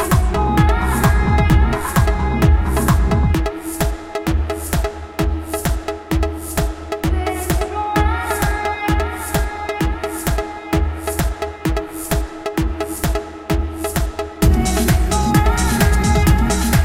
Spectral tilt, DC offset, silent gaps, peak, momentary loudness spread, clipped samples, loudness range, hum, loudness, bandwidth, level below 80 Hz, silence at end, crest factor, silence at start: -5.5 dB/octave; under 0.1%; none; -2 dBFS; 7 LU; under 0.1%; 6 LU; none; -19 LUFS; 17 kHz; -20 dBFS; 0 s; 14 dB; 0 s